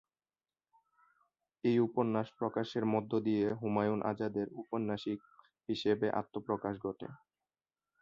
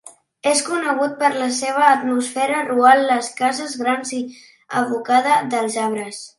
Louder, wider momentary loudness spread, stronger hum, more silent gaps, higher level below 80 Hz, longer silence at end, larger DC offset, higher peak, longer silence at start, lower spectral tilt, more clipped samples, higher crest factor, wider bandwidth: second, -35 LUFS vs -18 LUFS; about the same, 9 LU vs 9 LU; neither; neither; about the same, -72 dBFS vs -74 dBFS; first, 0.85 s vs 0.1 s; neither; second, -18 dBFS vs 0 dBFS; first, 1.65 s vs 0.05 s; first, -8 dB/octave vs -2.5 dB/octave; neither; about the same, 18 dB vs 18 dB; second, 7.4 kHz vs 11.5 kHz